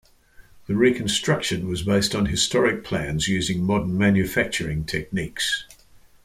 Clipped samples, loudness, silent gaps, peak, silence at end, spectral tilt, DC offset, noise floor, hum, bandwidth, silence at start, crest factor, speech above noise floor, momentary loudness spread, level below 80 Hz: under 0.1%; -22 LUFS; none; -6 dBFS; 0.25 s; -4.5 dB/octave; under 0.1%; -52 dBFS; none; 15.5 kHz; 0.4 s; 18 dB; 29 dB; 7 LU; -44 dBFS